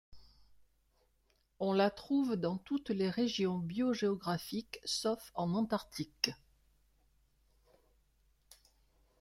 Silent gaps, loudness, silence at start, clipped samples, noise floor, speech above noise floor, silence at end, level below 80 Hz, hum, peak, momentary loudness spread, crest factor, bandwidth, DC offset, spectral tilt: none; -36 LUFS; 0.1 s; under 0.1%; -75 dBFS; 40 dB; 2.85 s; -70 dBFS; none; -12 dBFS; 6 LU; 26 dB; 16 kHz; under 0.1%; -5 dB/octave